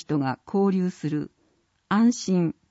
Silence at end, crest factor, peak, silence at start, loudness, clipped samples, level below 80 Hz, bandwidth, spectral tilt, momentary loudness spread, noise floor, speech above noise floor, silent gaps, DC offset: 0.2 s; 12 dB; -12 dBFS; 0.1 s; -25 LUFS; under 0.1%; -66 dBFS; 8 kHz; -6.5 dB/octave; 8 LU; -68 dBFS; 44 dB; none; under 0.1%